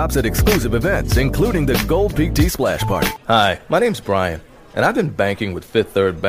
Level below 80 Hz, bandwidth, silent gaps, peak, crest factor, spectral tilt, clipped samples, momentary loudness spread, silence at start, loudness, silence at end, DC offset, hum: -26 dBFS; 16 kHz; none; -2 dBFS; 16 dB; -5.5 dB/octave; under 0.1%; 4 LU; 0 s; -18 LUFS; 0 s; under 0.1%; none